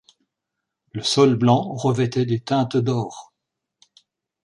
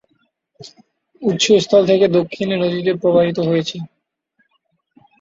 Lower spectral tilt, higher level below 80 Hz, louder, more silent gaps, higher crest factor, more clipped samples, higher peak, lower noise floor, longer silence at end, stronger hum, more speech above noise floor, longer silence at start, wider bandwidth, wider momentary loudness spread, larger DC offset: about the same, -6 dB/octave vs -5 dB/octave; about the same, -60 dBFS vs -58 dBFS; second, -20 LUFS vs -16 LUFS; neither; about the same, 18 dB vs 16 dB; neither; about the same, -4 dBFS vs -2 dBFS; first, -82 dBFS vs -67 dBFS; about the same, 1.25 s vs 1.35 s; neither; first, 62 dB vs 51 dB; first, 0.95 s vs 0.6 s; first, 11 kHz vs 7.8 kHz; about the same, 13 LU vs 11 LU; neither